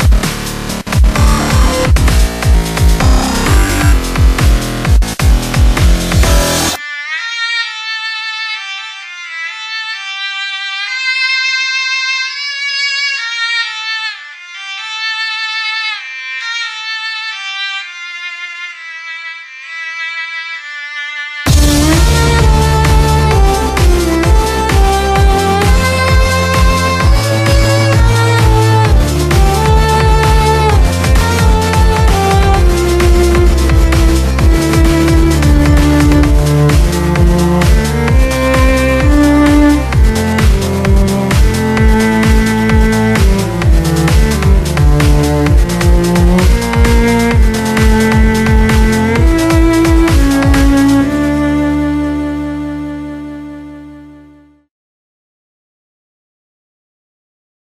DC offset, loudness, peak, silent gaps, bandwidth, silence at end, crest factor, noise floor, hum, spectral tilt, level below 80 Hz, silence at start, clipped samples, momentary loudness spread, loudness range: under 0.1%; -11 LUFS; 0 dBFS; none; 14.5 kHz; 3.5 s; 10 dB; -42 dBFS; none; -5.5 dB/octave; -14 dBFS; 0 s; under 0.1%; 10 LU; 8 LU